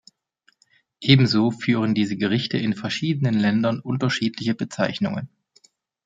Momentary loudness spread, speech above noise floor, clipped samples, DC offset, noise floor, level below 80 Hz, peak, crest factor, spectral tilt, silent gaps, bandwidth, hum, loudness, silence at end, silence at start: 9 LU; 43 dB; under 0.1%; under 0.1%; -65 dBFS; -62 dBFS; -2 dBFS; 22 dB; -6.5 dB/octave; none; 7.8 kHz; none; -22 LUFS; 0.8 s; 1 s